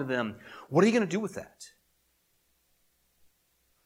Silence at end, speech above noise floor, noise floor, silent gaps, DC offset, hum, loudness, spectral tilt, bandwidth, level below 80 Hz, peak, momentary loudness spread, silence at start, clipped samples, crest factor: 2.2 s; 43 dB; -72 dBFS; none; under 0.1%; none; -28 LUFS; -6 dB/octave; 15.5 kHz; -74 dBFS; -10 dBFS; 25 LU; 0 s; under 0.1%; 24 dB